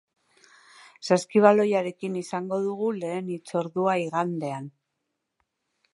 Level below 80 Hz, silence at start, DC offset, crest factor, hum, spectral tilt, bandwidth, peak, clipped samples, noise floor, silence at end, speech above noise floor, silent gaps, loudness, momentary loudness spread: -78 dBFS; 1 s; under 0.1%; 24 dB; none; -6 dB/octave; 11.5 kHz; -2 dBFS; under 0.1%; -81 dBFS; 1.25 s; 56 dB; none; -25 LUFS; 13 LU